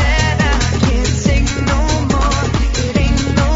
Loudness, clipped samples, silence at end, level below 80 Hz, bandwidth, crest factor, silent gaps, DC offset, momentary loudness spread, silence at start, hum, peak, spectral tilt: -15 LUFS; under 0.1%; 0 s; -18 dBFS; 7.8 kHz; 14 dB; none; under 0.1%; 2 LU; 0 s; none; 0 dBFS; -5 dB/octave